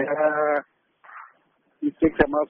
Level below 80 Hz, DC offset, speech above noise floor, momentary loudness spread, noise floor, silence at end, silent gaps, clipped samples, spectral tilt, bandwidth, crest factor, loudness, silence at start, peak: -48 dBFS; under 0.1%; 43 dB; 23 LU; -65 dBFS; 0.05 s; none; under 0.1%; -1 dB/octave; 3.7 kHz; 20 dB; -23 LUFS; 0 s; -4 dBFS